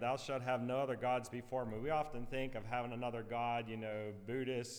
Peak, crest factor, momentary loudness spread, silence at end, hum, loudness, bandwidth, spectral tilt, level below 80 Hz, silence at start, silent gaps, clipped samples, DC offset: -26 dBFS; 14 dB; 5 LU; 0 s; none; -41 LUFS; over 20 kHz; -5.5 dB/octave; -58 dBFS; 0 s; none; under 0.1%; under 0.1%